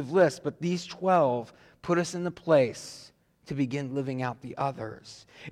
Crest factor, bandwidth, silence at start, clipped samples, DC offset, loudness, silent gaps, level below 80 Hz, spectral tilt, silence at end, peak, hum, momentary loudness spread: 16 dB; 13 kHz; 0 s; under 0.1%; under 0.1%; -28 LUFS; none; -66 dBFS; -6 dB/octave; 0 s; -12 dBFS; none; 19 LU